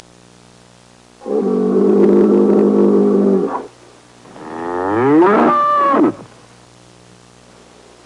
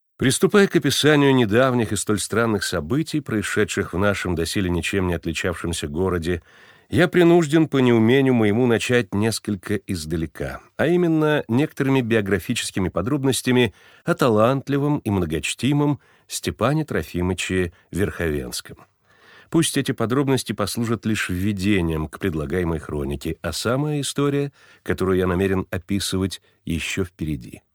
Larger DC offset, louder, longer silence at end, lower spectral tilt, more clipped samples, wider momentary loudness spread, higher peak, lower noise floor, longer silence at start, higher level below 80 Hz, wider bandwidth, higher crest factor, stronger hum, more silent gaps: neither; first, -13 LUFS vs -21 LUFS; first, 1.8 s vs 0.15 s; first, -8.5 dB/octave vs -5.5 dB/octave; neither; first, 16 LU vs 10 LU; about the same, -2 dBFS vs -2 dBFS; second, -46 dBFS vs -52 dBFS; first, 1.25 s vs 0.2 s; second, -58 dBFS vs -44 dBFS; second, 10.5 kHz vs over 20 kHz; second, 12 dB vs 20 dB; first, 60 Hz at -45 dBFS vs none; neither